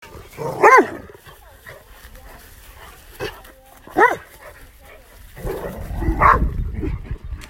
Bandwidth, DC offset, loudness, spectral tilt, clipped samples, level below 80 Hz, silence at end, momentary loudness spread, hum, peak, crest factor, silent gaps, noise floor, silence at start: 16.5 kHz; under 0.1%; -18 LUFS; -6 dB/octave; under 0.1%; -32 dBFS; 0.05 s; 26 LU; none; 0 dBFS; 22 dB; none; -44 dBFS; 0.05 s